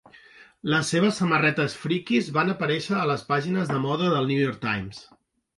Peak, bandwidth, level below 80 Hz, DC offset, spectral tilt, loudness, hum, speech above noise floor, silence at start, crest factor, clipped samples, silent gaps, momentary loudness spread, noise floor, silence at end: -10 dBFS; 11.5 kHz; -60 dBFS; under 0.1%; -5.5 dB/octave; -24 LUFS; none; 27 dB; 0.4 s; 16 dB; under 0.1%; none; 7 LU; -52 dBFS; 0.55 s